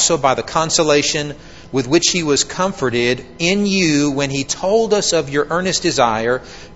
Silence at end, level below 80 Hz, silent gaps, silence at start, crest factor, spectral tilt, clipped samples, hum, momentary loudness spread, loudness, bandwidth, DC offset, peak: 0 s; -46 dBFS; none; 0 s; 16 dB; -3.5 dB/octave; under 0.1%; none; 6 LU; -16 LUFS; 8.2 kHz; 0.6%; 0 dBFS